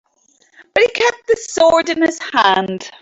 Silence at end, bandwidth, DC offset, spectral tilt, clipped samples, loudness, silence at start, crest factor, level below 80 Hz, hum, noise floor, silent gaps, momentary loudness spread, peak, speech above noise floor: 0.1 s; 8.2 kHz; under 0.1%; -3 dB/octave; under 0.1%; -15 LUFS; 0.75 s; 14 dB; -54 dBFS; none; -57 dBFS; none; 7 LU; -2 dBFS; 42 dB